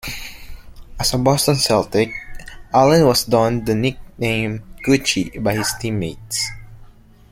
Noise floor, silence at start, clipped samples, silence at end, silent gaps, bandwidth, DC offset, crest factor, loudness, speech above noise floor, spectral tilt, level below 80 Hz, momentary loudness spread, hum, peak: -44 dBFS; 0.05 s; under 0.1%; 0.45 s; none; 16.5 kHz; under 0.1%; 18 dB; -18 LUFS; 26 dB; -4.5 dB/octave; -40 dBFS; 12 LU; none; -2 dBFS